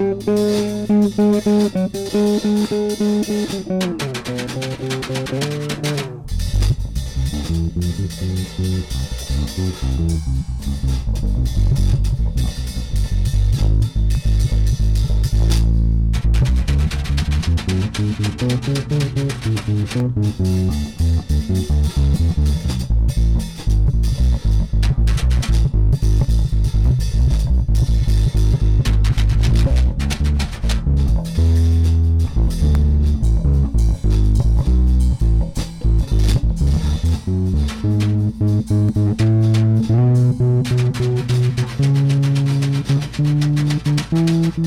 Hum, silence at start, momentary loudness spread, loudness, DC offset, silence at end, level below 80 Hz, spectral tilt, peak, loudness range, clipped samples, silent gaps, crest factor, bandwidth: none; 0 s; 7 LU; -18 LUFS; under 0.1%; 0 s; -20 dBFS; -7 dB/octave; -8 dBFS; 6 LU; under 0.1%; none; 8 dB; 14.5 kHz